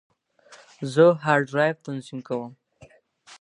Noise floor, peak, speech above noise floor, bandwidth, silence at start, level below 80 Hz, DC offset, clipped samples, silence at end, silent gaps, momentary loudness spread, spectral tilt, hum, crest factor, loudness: -54 dBFS; -4 dBFS; 32 dB; 11 kHz; 0.5 s; -72 dBFS; under 0.1%; under 0.1%; 0.1 s; none; 16 LU; -6.5 dB/octave; none; 20 dB; -23 LUFS